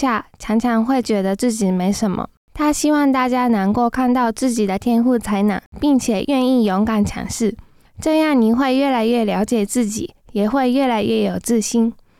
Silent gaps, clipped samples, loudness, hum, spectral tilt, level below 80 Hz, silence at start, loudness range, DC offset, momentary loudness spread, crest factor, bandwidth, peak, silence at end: 2.37-2.48 s, 5.66-5.72 s; under 0.1%; -18 LUFS; none; -5 dB/octave; -44 dBFS; 0 s; 1 LU; under 0.1%; 6 LU; 10 dB; 15.5 kHz; -6 dBFS; 0.25 s